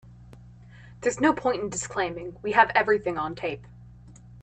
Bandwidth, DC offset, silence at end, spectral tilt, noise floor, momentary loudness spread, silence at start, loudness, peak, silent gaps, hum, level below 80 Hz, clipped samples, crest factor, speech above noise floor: 9.2 kHz; under 0.1%; 0 s; -4 dB/octave; -48 dBFS; 13 LU; 0.05 s; -25 LUFS; -4 dBFS; none; 60 Hz at -45 dBFS; -54 dBFS; under 0.1%; 24 dB; 23 dB